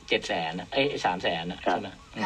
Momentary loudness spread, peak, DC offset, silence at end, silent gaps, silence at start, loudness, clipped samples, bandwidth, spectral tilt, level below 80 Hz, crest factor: 4 LU; -8 dBFS; under 0.1%; 0 s; none; 0 s; -28 LUFS; under 0.1%; 11.5 kHz; -4.5 dB/octave; -56 dBFS; 20 dB